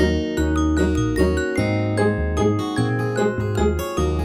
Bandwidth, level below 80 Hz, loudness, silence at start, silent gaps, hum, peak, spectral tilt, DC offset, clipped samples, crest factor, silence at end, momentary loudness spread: 15.5 kHz; -30 dBFS; -21 LUFS; 0 s; none; none; -6 dBFS; -6.5 dB/octave; under 0.1%; under 0.1%; 14 dB; 0 s; 2 LU